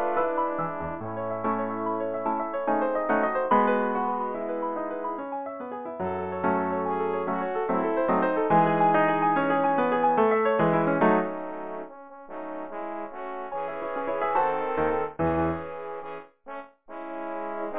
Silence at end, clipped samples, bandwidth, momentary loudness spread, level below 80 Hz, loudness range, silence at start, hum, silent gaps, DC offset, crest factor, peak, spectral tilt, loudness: 0 s; under 0.1%; 4 kHz; 14 LU; -56 dBFS; 7 LU; 0 s; none; none; 0.5%; 18 dB; -8 dBFS; -10.5 dB/octave; -26 LUFS